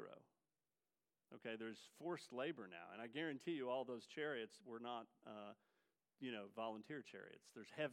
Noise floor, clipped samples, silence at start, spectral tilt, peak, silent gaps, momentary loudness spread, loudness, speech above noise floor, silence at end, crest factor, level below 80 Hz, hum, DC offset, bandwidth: under -90 dBFS; under 0.1%; 0 s; -5 dB/octave; -32 dBFS; none; 13 LU; -51 LUFS; over 40 dB; 0 s; 20 dB; under -90 dBFS; none; under 0.1%; 15.5 kHz